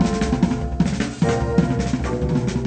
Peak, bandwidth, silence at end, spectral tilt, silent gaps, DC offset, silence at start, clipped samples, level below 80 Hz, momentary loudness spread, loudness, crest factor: -4 dBFS; 9.2 kHz; 0 s; -7 dB/octave; none; under 0.1%; 0 s; under 0.1%; -30 dBFS; 3 LU; -21 LUFS; 16 dB